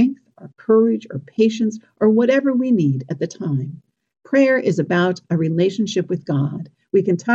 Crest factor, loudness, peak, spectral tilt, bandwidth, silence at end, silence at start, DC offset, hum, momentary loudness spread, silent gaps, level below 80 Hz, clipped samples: 14 dB; -19 LUFS; -4 dBFS; -7 dB/octave; 7.8 kHz; 0 s; 0 s; under 0.1%; none; 10 LU; none; -66 dBFS; under 0.1%